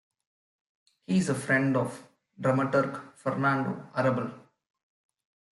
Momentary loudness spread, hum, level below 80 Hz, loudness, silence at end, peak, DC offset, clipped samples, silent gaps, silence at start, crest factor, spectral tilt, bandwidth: 10 LU; none; -72 dBFS; -28 LUFS; 1.15 s; -12 dBFS; under 0.1%; under 0.1%; none; 1.1 s; 18 dB; -6.5 dB/octave; 12 kHz